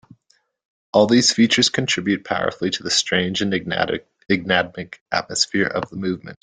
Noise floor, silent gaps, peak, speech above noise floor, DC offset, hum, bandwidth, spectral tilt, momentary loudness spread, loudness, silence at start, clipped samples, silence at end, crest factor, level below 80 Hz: -64 dBFS; 5.01-5.06 s; -2 dBFS; 44 dB; under 0.1%; none; 9.6 kHz; -3.5 dB/octave; 11 LU; -19 LUFS; 0.95 s; under 0.1%; 0.1 s; 20 dB; -58 dBFS